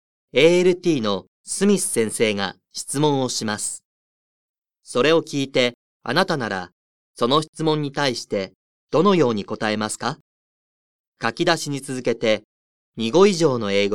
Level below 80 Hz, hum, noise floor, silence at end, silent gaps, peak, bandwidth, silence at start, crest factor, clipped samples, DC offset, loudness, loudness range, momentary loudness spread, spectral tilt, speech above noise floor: -60 dBFS; none; under -90 dBFS; 0 s; 1.28-1.44 s, 3.85-4.62 s, 5.74-6.00 s, 6.72-7.14 s, 7.48-7.53 s, 8.55-8.87 s, 10.21-11.13 s, 12.44-12.93 s; -2 dBFS; 18.5 kHz; 0.35 s; 20 dB; under 0.1%; 0.5%; -21 LUFS; 3 LU; 11 LU; -4 dB/octave; over 70 dB